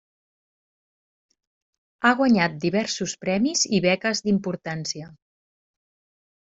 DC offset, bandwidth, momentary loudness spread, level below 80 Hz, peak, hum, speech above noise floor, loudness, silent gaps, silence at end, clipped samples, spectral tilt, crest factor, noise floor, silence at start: under 0.1%; 8 kHz; 10 LU; -64 dBFS; -4 dBFS; none; over 67 dB; -23 LUFS; none; 1.35 s; under 0.1%; -4 dB/octave; 22 dB; under -90 dBFS; 2 s